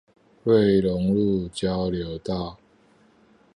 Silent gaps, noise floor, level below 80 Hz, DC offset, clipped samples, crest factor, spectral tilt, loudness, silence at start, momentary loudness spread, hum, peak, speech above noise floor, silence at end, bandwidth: none; -58 dBFS; -46 dBFS; under 0.1%; under 0.1%; 18 dB; -7.5 dB/octave; -23 LUFS; 0.45 s; 12 LU; none; -8 dBFS; 36 dB; 1 s; 10.5 kHz